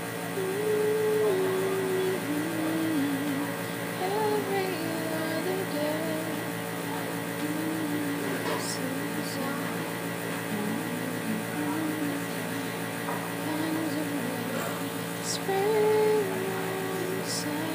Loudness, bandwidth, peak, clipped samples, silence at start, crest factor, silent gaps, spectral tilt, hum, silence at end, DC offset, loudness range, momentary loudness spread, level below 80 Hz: -29 LUFS; 15.5 kHz; -14 dBFS; under 0.1%; 0 s; 14 dB; none; -4.5 dB/octave; none; 0 s; under 0.1%; 3 LU; 6 LU; -74 dBFS